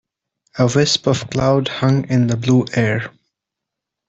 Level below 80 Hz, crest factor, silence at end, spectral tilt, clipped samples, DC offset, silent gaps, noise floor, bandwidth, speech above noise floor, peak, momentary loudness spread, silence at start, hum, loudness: -48 dBFS; 16 dB; 1 s; -5.5 dB/octave; under 0.1%; under 0.1%; none; -82 dBFS; 8 kHz; 66 dB; -2 dBFS; 5 LU; 0.55 s; none; -17 LUFS